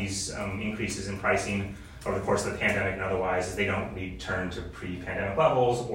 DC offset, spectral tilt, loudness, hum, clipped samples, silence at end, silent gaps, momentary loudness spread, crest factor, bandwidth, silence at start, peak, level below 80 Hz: under 0.1%; -4.5 dB/octave; -29 LUFS; none; under 0.1%; 0 s; none; 11 LU; 18 dB; 16 kHz; 0 s; -10 dBFS; -48 dBFS